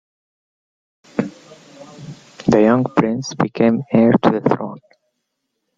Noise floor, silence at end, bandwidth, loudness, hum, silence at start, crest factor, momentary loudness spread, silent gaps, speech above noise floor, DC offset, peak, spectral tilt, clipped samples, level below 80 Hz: -74 dBFS; 1 s; 7.6 kHz; -17 LUFS; none; 1.15 s; 18 dB; 21 LU; none; 59 dB; under 0.1%; -2 dBFS; -7 dB/octave; under 0.1%; -54 dBFS